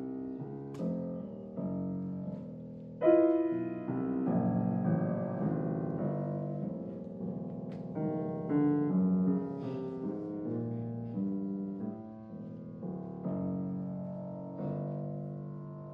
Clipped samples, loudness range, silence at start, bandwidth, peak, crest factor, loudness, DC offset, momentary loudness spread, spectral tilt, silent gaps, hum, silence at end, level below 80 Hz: under 0.1%; 8 LU; 0 s; 3.5 kHz; -14 dBFS; 20 dB; -35 LUFS; under 0.1%; 13 LU; -12 dB/octave; none; none; 0 s; -70 dBFS